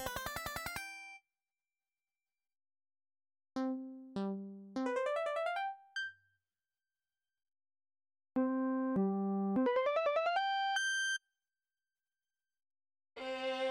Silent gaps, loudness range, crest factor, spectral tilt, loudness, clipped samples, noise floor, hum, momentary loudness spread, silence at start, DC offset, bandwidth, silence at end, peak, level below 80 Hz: none; 12 LU; 16 dB; -4.5 dB/octave; -37 LUFS; under 0.1%; under -90 dBFS; none; 12 LU; 0 s; under 0.1%; 16.5 kHz; 0 s; -24 dBFS; -70 dBFS